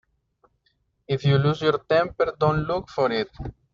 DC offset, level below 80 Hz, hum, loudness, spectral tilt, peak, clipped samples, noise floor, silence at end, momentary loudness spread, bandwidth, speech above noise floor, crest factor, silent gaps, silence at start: under 0.1%; -48 dBFS; none; -23 LUFS; -5.5 dB/octave; -8 dBFS; under 0.1%; -70 dBFS; 0.2 s; 8 LU; 7.2 kHz; 47 dB; 18 dB; none; 1.1 s